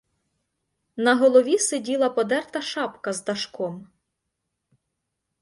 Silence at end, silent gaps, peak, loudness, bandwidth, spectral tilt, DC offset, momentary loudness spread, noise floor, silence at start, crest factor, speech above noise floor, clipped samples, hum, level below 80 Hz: 1.6 s; none; -6 dBFS; -23 LUFS; 11.5 kHz; -3 dB/octave; under 0.1%; 14 LU; -80 dBFS; 0.95 s; 20 dB; 58 dB; under 0.1%; none; -72 dBFS